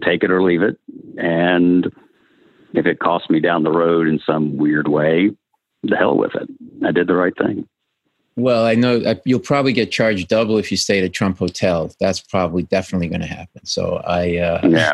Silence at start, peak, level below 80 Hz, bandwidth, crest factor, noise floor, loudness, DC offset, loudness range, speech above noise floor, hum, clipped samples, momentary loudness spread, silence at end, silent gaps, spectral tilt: 0 s; 0 dBFS; -54 dBFS; 12 kHz; 16 dB; -70 dBFS; -17 LUFS; under 0.1%; 3 LU; 54 dB; none; under 0.1%; 9 LU; 0 s; none; -5.5 dB/octave